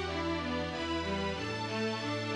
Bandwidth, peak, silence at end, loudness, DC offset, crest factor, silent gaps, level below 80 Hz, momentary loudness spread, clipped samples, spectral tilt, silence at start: 11.5 kHz; -22 dBFS; 0 s; -34 LUFS; under 0.1%; 12 dB; none; -52 dBFS; 1 LU; under 0.1%; -5 dB/octave; 0 s